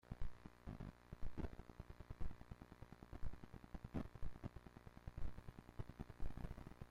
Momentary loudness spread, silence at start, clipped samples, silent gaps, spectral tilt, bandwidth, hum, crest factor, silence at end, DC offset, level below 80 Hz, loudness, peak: 8 LU; 0.1 s; under 0.1%; none; -7.5 dB/octave; 6.8 kHz; none; 16 dB; 0.05 s; under 0.1%; -54 dBFS; -56 LUFS; -32 dBFS